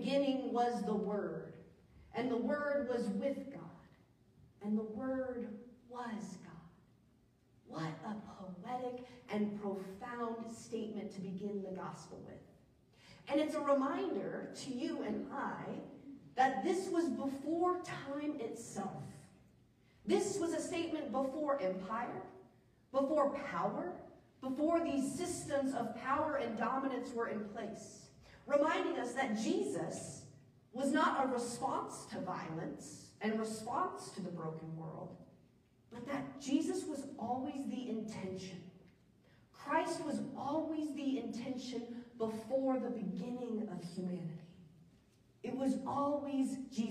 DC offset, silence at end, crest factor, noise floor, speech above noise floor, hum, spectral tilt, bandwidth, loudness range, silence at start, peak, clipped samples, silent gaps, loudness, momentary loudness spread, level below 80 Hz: under 0.1%; 0 s; 20 dB; -70 dBFS; 32 dB; none; -5.5 dB/octave; 15 kHz; 7 LU; 0 s; -20 dBFS; under 0.1%; none; -39 LUFS; 16 LU; -74 dBFS